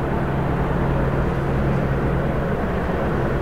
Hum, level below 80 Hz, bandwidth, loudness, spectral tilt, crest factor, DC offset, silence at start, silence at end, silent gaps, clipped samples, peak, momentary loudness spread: none; -28 dBFS; 9.6 kHz; -22 LUFS; -8.5 dB/octave; 12 dB; 0.6%; 0 s; 0 s; none; under 0.1%; -8 dBFS; 2 LU